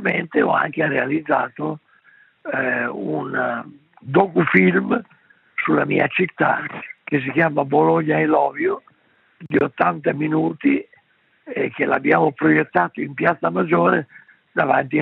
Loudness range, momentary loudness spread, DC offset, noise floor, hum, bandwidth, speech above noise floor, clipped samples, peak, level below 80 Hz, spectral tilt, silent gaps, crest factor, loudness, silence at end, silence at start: 4 LU; 9 LU; under 0.1%; -59 dBFS; none; 4.5 kHz; 40 dB; under 0.1%; 0 dBFS; -66 dBFS; -10 dB/octave; none; 20 dB; -19 LUFS; 0 s; 0 s